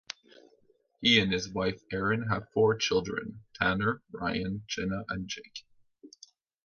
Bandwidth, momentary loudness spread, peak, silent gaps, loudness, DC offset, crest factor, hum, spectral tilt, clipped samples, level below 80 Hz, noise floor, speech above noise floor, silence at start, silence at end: 7.2 kHz; 16 LU; -8 dBFS; none; -29 LUFS; under 0.1%; 22 dB; none; -4.5 dB/octave; under 0.1%; -56 dBFS; -67 dBFS; 37 dB; 1 s; 0.6 s